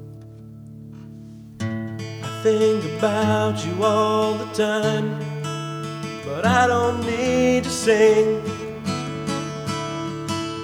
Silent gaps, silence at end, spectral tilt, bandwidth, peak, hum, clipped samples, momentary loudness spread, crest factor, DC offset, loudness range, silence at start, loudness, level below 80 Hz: none; 0 s; -5 dB/octave; 16 kHz; -4 dBFS; none; under 0.1%; 22 LU; 18 dB; under 0.1%; 4 LU; 0 s; -22 LUFS; -52 dBFS